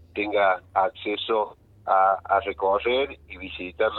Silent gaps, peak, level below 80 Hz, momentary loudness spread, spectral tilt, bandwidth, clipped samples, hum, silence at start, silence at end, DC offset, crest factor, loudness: none; -6 dBFS; -54 dBFS; 13 LU; -7 dB/octave; 4.3 kHz; under 0.1%; none; 0.15 s; 0 s; under 0.1%; 18 dB; -24 LUFS